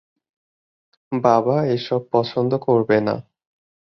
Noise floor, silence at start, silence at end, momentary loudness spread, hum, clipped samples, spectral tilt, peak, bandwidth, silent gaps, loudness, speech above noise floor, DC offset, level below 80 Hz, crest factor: under -90 dBFS; 1.1 s; 0.75 s; 7 LU; none; under 0.1%; -8 dB/octave; -2 dBFS; 6.4 kHz; none; -20 LUFS; over 71 dB; under 0.1%; -62 dBFS; 20 dB